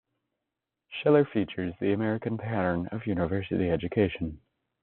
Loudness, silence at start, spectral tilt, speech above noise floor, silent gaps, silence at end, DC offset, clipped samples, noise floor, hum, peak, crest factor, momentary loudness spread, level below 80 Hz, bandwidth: -28 LUFS; 0.9 s; -6.5 dB/octave; 59 dB; none; 0.45 s; under 0.1%; under 0.1%; -87 dBFS; none; -8 dBFS; 20 dB; 9 LU; -56 dBFS; 4.3 kHz